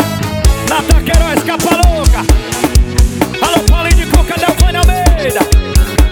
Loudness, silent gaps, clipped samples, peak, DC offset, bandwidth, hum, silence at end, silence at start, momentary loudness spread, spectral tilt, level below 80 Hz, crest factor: -11 LUFS; none; 0.7%; 0 dBFS; under 0.1%; 19.5 kHz; none; 0 s; 0 s; 3 LU; -5 dB/octave; -12 dBFS; 10 dB